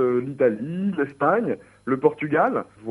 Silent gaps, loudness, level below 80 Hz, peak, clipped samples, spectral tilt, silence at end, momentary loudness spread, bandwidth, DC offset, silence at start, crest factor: none; -23 LUFS; -66 dBFS; -4 dBFS; under 0.1%; -9 dB/octave; 0 s; 7 LU; 10.5 kHz; under 0.1%; 0 s; 18 dB